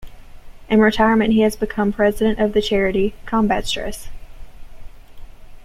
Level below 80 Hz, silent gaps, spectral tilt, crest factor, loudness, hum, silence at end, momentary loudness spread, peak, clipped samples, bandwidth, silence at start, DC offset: -36 dBFS; none; -5.5 dB/octave; 18 dB; -18 LUFS; none; 0 s; 8 LU; -2 dBFS; under 0.1%; 14.5 kHz; 0 s; under 0.1%